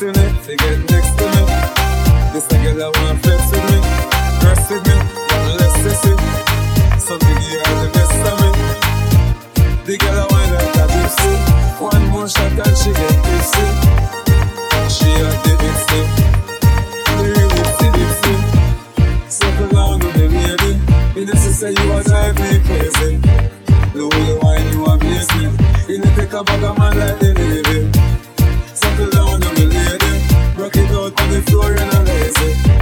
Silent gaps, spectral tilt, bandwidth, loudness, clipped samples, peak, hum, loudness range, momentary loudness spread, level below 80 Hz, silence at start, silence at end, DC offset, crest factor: none; -5 dB/octave; 19.5 kHz; -14 LUFS; under 0.1%; 0 dBFS; none; 1 LU; 3 LU; -16 dBFS; 0 s; 0 s; under 0.1%; 12 dB